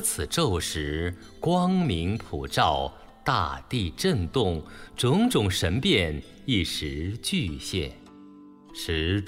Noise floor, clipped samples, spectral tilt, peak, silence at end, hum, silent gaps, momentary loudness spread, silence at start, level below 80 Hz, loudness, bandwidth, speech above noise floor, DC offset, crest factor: -49 dBFS; under 0.1%; -4.5 dB/octave; -8 dBFS; 0 s; none; none; 9 LU; 0 s; -42 dBFS; -26 LUFS; 16 kHz; 22 dB; under 0.1%; 18 dB